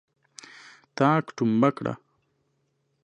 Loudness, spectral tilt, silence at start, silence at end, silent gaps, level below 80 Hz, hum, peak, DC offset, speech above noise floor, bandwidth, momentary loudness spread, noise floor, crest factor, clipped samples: -24 LUFS; -7 dB/octave; 0.95 s; 1.1 s; none; -72 dBFS; none; -6 dBFS; under 0.1%; 50 dB; 10 kHz; 23 LU; -73 dBFS; 22 dB; under 0.1%